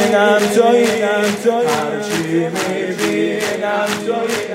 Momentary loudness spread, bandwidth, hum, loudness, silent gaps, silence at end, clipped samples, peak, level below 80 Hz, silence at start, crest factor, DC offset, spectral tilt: 7 LU; 16 kHz; none; -16 LUFS; none; 0 s; under 0.1%; -2 dBFS; -64 dBFS; 0 s; 14 dB; under 0.1%; -4 dB/octave